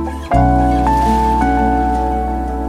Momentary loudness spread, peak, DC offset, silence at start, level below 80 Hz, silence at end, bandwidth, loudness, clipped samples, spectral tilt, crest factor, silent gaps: 5 LU; 0 dBFS; under 0.1%; 0 s; -20 dBFS; 0 s; 12.5 kHz; -15 LUFS; under 0.1%; -7.5 dB/octave; 14 dB; none